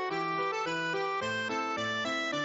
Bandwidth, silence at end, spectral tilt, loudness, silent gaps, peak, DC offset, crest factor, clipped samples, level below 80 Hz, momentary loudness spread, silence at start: 8 kHz; 0 s; -1.5 dB/octave; -32 LUFS; none; -22 dBFS; under 0.1%; 10 dB; under 0.1%; -72 dBFS; 1 LU; 0 s